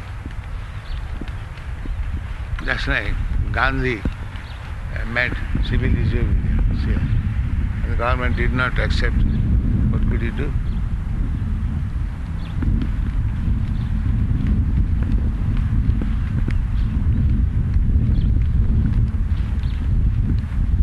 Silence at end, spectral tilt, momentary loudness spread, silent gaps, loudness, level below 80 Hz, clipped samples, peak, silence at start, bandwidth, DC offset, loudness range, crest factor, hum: 0 s; -8 dB/octave; 11 LU; none; -22 LUFS; -22 dBFS; under 0.1%; -4 dBFS; 0 s; 7 kHz; under 0.1%; 4 LU; 16 dB; none